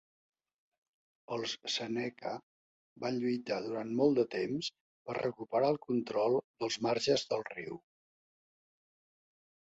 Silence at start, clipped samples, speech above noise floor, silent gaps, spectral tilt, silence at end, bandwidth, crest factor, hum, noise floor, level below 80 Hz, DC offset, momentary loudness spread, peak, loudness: 1.3 s; under 0.1%; over 56 dB; 2.43-2.96 s, 4.81-5.05 s, 6.44-6.54 s; -4.5 dB/octave; 1.85 s; 8 kHz; 20 dB; none; under -90 dBFS; -76 dBFS; under 0.1%; 12 LU; -16 dBFS; -34 LUFS